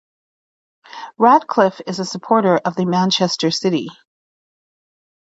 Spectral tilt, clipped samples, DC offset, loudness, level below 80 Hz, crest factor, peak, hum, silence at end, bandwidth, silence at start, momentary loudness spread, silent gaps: -5 dB/octave; under 0.1%; under 0.1%; -17 LUFS; -66 dBFS; 18 dB; 0 dBFS; none; 1.45 s; 8 kHz; 0.95 s; 12 LU; none